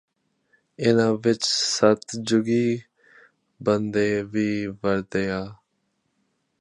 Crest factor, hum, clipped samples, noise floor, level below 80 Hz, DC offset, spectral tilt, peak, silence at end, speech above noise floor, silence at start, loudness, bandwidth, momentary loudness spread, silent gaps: 22 dB; none; under 0.1%; -73 dBFS; -58 dBFS; under 0.1%; -4.5 dB/octave; -4 dBFS; 1.05 s; 51 dB; 0.8 s; -23 LUFS; 11 kHz; 8 LU; none